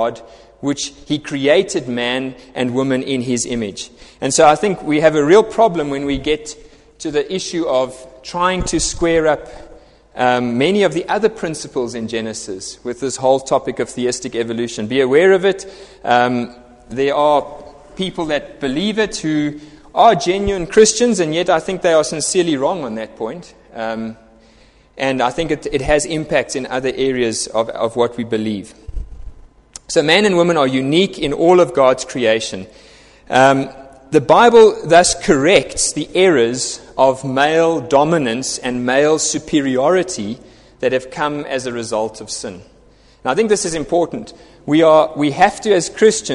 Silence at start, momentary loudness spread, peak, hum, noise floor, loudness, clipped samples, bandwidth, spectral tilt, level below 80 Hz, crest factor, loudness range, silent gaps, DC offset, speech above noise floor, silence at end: 0 s; 14 LU; 0 dBFS; none; -49 dBFS; -16 LUFS; under 0.1%; 11.5 kHz; -4 dB/octave; -42 dBFS; 16 dB; 7 LU; none; under 0.1%; 33 dB; 0 s